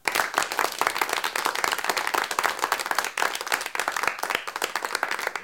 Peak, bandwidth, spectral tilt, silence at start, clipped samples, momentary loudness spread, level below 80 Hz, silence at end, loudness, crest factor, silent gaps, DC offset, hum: -4 dBFS; 17 kHz; 0 dB/octave; 0.05 s; under 0.1%; 3 LU; -64 dBFS; 0 s; -26 LUFS; 24 dB; none; under 0.1%; none